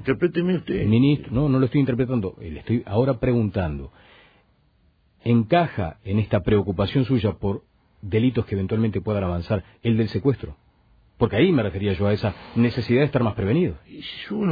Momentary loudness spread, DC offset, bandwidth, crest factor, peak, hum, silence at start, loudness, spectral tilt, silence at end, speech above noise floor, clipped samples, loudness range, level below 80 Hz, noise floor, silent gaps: 11 LU; under 0.1%; 5 kHz; 16 dB; -6 dBFS; none; 0 s; -22 LUFS; -10 dB/octave; 0 s; 40 dB; under 0.1%; 3 LU; -44 dBFS; -61 dBFS; none